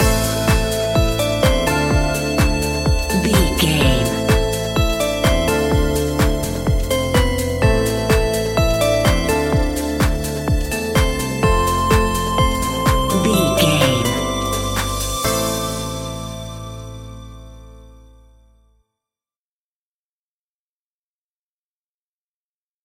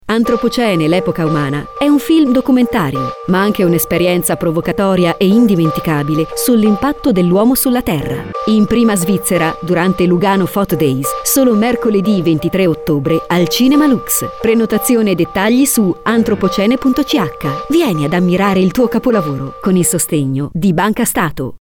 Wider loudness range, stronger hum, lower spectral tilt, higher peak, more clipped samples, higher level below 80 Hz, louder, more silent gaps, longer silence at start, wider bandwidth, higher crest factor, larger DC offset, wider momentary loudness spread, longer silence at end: first, 7 LU vs 1 LU; neither; about the same, -4.5 dB/octave vs -5 dB/octave; about the same, -2 dBFS vs 0 dBFS; neither; first, -24 dBFS vs -40 dBFS; second, -18 LUFS vs -13 LUFS; neither; about the same, 0 s vs 0.05 s; second, 17 kHz vs over 20 kHz; first, 18 dB vs 12 dB; neither; about the same, 6 LU vs 5 LU; first, 4.95 s vs 0.05 s